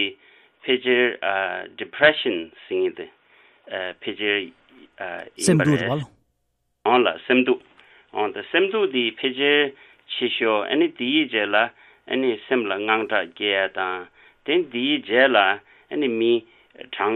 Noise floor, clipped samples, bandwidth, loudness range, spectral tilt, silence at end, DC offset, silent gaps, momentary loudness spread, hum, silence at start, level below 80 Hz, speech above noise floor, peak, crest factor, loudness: -72 dBFS; under 0.1%; 12.5 kHz; 3 LU; -4.5 dB/octave; 0 s; under 0.1%; none; 14 LU; none; 0 s; -68 dBFS; 51 dB; -2 dBFS; 20 dB; -22 LUFS